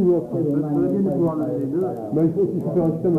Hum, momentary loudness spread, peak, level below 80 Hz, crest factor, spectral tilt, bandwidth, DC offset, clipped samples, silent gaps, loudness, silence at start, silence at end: none; 4 LU; -8 dBFS; -54 dBFS; 12 dB; -11.5 dB/octave; 2.7 kHz; under 0.1%; under 0.1%; none; -22 LUFS; 0 s; 0 s